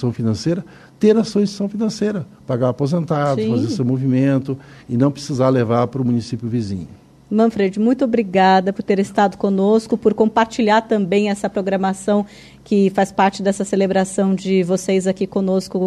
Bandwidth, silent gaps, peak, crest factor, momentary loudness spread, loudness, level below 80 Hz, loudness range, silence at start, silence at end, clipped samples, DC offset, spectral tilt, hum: 12 kHz; none; -4 dBFS; 14 dB; 7 LU; -18 LUFS; -54 dBFS; 3 LU; 0 s; 0 s; under 0.1%; under 0.1%; -6.5 dB/octave; none